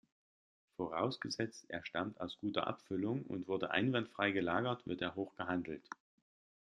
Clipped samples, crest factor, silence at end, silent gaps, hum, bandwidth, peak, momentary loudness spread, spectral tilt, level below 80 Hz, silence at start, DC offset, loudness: under 0.1%; 24 dB; 0.75 s; none; none; 10 kHz; -16 dBFS; 11 LU; -5.5 dB/octave; -76 dBFS; 0.8 s; under 0.1%; -39 LUFS